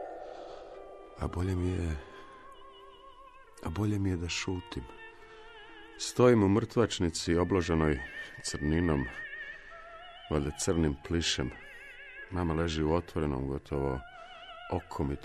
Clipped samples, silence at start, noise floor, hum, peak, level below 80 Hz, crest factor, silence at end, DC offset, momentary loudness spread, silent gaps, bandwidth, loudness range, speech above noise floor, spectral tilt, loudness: under 0.1%; 0 s; -53 dBFS; none; -10 dBFS; -46 dBFS; 22 dB; 0 s; under 0.1%; 22 LU; none; 13 kHz; 8 LU; 23 dB; -5.5 dB/octave; -31 LUFS